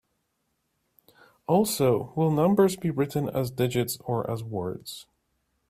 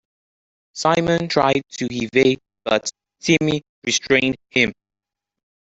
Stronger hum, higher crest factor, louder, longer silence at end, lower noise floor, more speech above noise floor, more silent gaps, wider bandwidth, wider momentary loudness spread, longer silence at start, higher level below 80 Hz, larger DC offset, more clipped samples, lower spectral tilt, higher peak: neither; about the same, 20 dB vs 20 dB; second, -26 LUFS vs -19 LUFS; second, 0.7 s vs 1.05 s; second, -76 dBFS vs -85 dBFS; second, 51 dB vs 66 dB; second, none vs 3.69-3.82 s; first, 16 kHz vs 8.2 kHz; first, 13 LU vs 9 LU; first, 1.5 s vs 0.75 s; second, -60 dBFS vs -54 dBFS; neither; neither; first, -6 dB/octave vs -4 dB/octave; second, -8 dBFS vs -2 dBFS